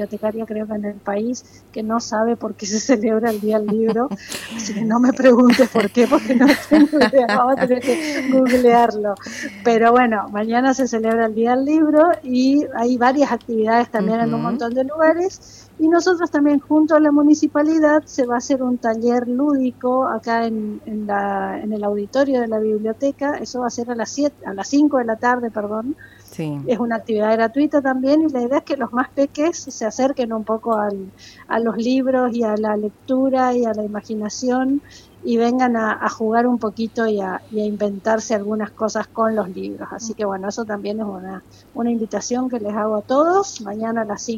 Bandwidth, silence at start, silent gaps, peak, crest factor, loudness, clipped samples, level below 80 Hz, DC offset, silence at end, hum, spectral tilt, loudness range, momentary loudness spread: 15.5 kHz; 0 s; none; -4 dBFS; 14 dB; -19 LUFS; under 0.1%; -56 dBFS; under 0.1%; 0 s; none; -5 dB/octave; 6 LU; 12 LU